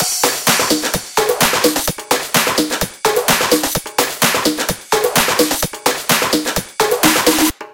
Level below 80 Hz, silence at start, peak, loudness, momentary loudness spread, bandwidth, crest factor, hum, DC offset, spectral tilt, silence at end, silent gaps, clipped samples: -42 dBFS; 0 s; 0 dBFS; -15 LUFS; 5 LU; 17.5 kHz; 16 dB; none; under 0.1%; -2 dB/octave; 0 s; none; under 0.1%